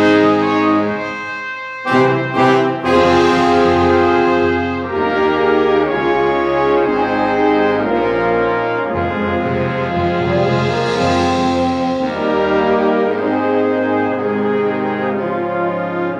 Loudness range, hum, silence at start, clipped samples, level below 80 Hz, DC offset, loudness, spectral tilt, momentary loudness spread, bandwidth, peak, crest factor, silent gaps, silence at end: 3 LU; none; 0 s; under 0.1%; -44 dBFS; under 0.1%; -15 LUFS; -6.5 dB/octave; 6 LU; 9.6 kHz; -2 dBFS; 12 dB; none; 0 s